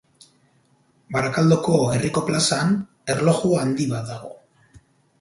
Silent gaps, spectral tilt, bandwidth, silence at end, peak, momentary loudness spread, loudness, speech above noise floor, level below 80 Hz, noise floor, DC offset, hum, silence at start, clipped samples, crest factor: none; -5.5 dB/octave; 11.5 kHz; 0.4 s; -4 dBFS; 10 LU; -21 LUFS; 41 dB; -54 dBFS; -61 dBFS; under 0.1%; none; 1.1 s; under 0.1%; 18 dB